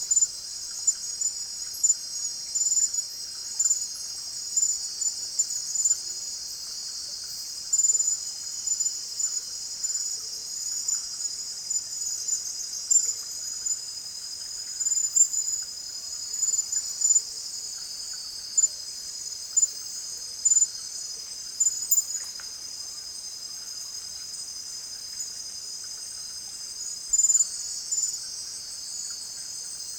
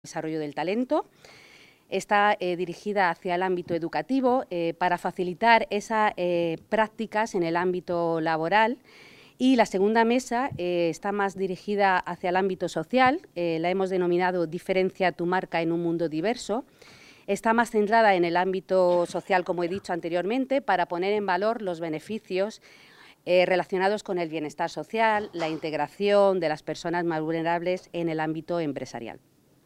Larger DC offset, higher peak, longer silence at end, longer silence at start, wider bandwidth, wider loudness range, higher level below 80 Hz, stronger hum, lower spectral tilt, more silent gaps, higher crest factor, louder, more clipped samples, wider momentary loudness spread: neither; about the same, -6 dBFS vs -4 dBFS; second, 0 s vs 0.5 s; about the same, 0 s vs 0.05 s; first, 16 kHz vs 14 kHz; about the same, 4 LU vs 3 LU; about the same, -66 dBFS vs -64 dBFS; neither; second, 3 dB/octave vs -5.5 dB/octave; neither; about the same, 24 dB vs 22 dB; about the same, -26 LUFS vs -26 LUFS; neither; first, 13 LU vs 9 LU